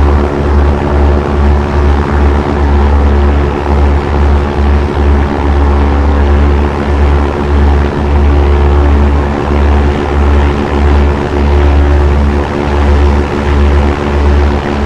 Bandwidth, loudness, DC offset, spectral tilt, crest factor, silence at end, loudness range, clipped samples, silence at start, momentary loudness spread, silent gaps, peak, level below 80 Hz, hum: 6.8 kHz; -10 LUFS; 2%; -8 dB/octave; 8 dB; 0 s; 1 LU; 0.5%; 0 s; 3 LU; none; 0 dBFS; -10 dBFS; none